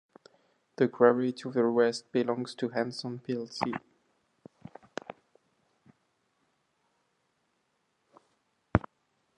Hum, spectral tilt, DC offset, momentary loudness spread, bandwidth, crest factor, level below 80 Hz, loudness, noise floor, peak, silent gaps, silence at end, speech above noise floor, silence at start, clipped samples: none; -6.5 dB/octave; under 0.1%; 20 LU; 10.5 kHz; 30 dB; -56 dBFS; -30 LUFS; -76 dBFS; -4 dBFS; none; 0.6 s; 48 dB; 0.8 s; under 0.1%